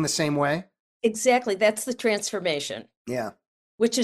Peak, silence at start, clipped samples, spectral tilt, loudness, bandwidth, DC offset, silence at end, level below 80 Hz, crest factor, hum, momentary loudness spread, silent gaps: -8 dBFS; 0 s; under 0.1%; -3.5 dB/octave; -25 LUFS; 15.5 kHz; under 0.1%; 0 s; -66 dBFS; 18 dB; none; 11 LU; 0.80-1.00 s, 2.97-3.05 s, 3.47-3.78 s